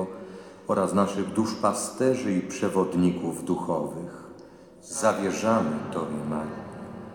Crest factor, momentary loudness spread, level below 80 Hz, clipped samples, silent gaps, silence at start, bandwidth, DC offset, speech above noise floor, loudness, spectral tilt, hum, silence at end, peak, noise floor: 18 dB; 16 LU; -62 dBFS; under 0.1%; none; 0 s; 18.5 kHz; under 0.1%; 22 dB; -27 LUFS; -5.5 dB/octave; none; 0 s; -8 dBFS; -48 dBFS